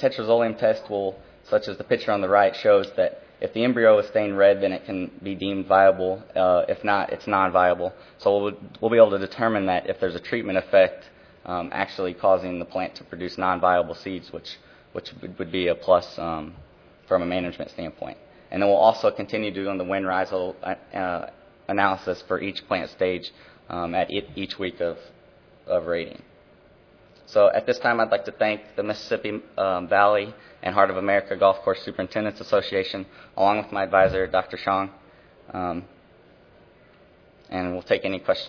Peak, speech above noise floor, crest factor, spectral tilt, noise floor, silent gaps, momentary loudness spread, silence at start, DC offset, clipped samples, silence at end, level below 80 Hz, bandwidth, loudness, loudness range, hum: -2 dBFS; 31 dB; 22 dB; -6.5 dB/octave; -54 dBFS; none; 15 LU; 0 s; under 0.1%; under 0.1%; 0 s; -58 dBFS; 5.4 kHz; -23 LUFS; 7 LU; none